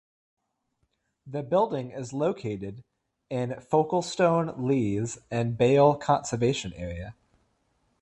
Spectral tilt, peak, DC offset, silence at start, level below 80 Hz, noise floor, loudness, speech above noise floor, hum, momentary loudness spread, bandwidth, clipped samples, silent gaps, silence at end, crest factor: -6 dB/octave; -8 dBFS; under 0.1%; 1.25 s; -54 dBFS; -76 dBFS; -27 LUFS; 50 dB; none; 15 LU; 11.5 kHz; under 0.1%; none; 0.9 s; 20 dB